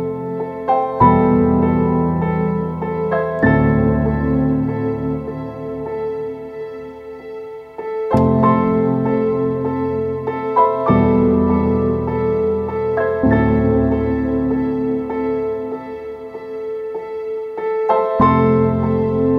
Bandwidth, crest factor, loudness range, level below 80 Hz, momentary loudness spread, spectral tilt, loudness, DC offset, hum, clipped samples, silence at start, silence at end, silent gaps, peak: 5.4 kHz; 16 dB; 7 LU; -34 dBFS; 14 LU; -10.5 dB/octave; -17 LUFS; under 0.1%; none; under 0.1%; 0 s; 0 s; none; 0 dBFS